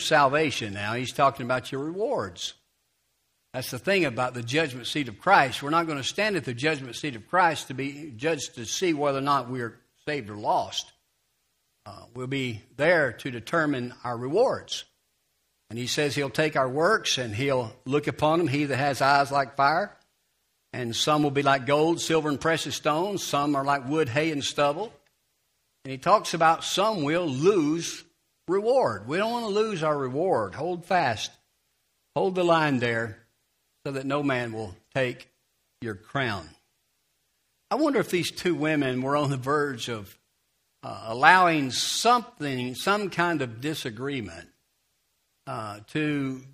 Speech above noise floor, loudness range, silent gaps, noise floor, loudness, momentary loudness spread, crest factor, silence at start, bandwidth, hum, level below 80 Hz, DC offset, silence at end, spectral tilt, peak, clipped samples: 48 dB; 6 LU; none; -73 dBFS; -26 LUFS; 13 LU; 26 dB; 0 s; 15.5 kHz; none; -64 dBFS; under 0.1%; 0.05 s; -4.5 dB/octave; 0 dBFS; under 0.1%